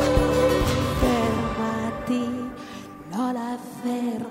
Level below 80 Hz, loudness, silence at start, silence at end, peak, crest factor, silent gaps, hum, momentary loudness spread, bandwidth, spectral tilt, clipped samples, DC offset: -36 dBFS; -25 LUFS; 0 s; 0 s; -8 dBFS; 16 dB; none; none; 13 LU; 16 kHz; -6 dB/octave; under 0.1%; under 0.1%